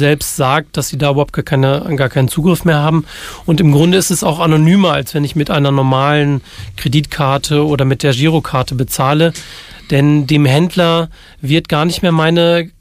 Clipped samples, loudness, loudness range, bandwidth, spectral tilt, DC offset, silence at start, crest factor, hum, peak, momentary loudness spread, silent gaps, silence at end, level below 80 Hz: under 0.1%; -13 LUFS; 2 LU; 16 kHz; -5.5 dB/octave; under 0.1%; 0 s; 12 dB; none; 0 dBFS; 7 LU; none; 0.1 s; -38 dBFS